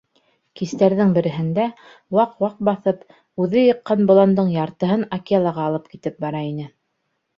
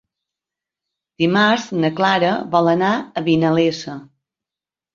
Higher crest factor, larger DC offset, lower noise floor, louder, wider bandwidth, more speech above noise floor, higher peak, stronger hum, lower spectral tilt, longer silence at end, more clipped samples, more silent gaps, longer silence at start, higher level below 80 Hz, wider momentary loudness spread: about the same, 18 dB vs 18 dB; neither; second, -73 dBFS vs -89 dBFS; about the same, -19 LUFS vs -17 LUFS; about the same, 7.2 kHz vs 7.6 kHz; second, 54 dB vs 72 dB; about the same, -2 dBFS vs -2 dBFS; neither; first, -8.5 dB/octave vs -6 dB/octave; second, 0.7 s vs 0.9 s; neither; neither; second, 0.55 s vs 1.2 s; about the same, -62 dBFS vs -62 dBFS; first, 14 LU vs 6 LU